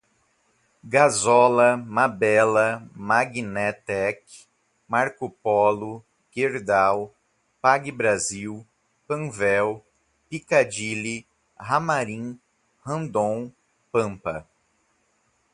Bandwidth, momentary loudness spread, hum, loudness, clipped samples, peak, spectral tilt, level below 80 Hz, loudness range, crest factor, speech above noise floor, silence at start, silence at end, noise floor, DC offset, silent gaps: 11.5 kHz; 18 LU; none; -23 LUFS; under 0.1%; -2 dBFS; -4.5 dB/octave; -62 dBFS; 7 LU; 22 dB; 45 dB; 0.85 s; 1.1 s; -68 dBFS; under 0.1%; none